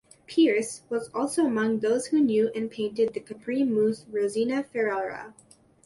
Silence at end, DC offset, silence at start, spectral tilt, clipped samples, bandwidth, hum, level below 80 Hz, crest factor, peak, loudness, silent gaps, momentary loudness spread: 0.55 s; under 0.1%; 0.3 s; -5 dB/octave; under 0.1%; 11.5 kHz; none; -68 dBFS; 14 dB; -12 dBFS; -26 LUFS; none; 9 LU